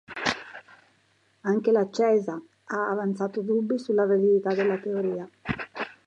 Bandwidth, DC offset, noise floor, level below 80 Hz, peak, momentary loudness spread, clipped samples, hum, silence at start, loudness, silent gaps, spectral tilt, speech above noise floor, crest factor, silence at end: 8.8 kHz; under 0.1%; -66 dBFS; -62 dBFS; -8 dBFS; 13 LU; under 0.1%; none; 0.1 s; -26 LUFS; none; -6 dB/octave; 41 dB; 18 dB; 0.15 s